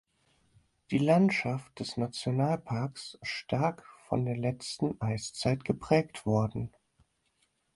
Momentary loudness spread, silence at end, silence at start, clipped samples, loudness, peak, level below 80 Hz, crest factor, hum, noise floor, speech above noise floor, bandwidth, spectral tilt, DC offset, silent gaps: 11 LU; 1.05 s; 0.9 s; under 0.1%; -31 LUFS; -12 dBFS; -60 dBFS; 20 dB; none; -74 dBFS; 44 dB; 11.5 kHz; -6.5 dB/octave; under 0.1%; none